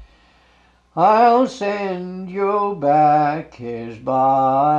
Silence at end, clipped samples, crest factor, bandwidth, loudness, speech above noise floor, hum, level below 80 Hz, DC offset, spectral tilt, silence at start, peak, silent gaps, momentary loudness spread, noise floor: 0 s; under 0.1%; 16 dB; 8 kHz; -17 LUFS; 38 dB; none; -56 dBFS; under 0.1%; -7 dB/octave; 0 s; -2 dBFS; none; 15 LU; -55 dBFS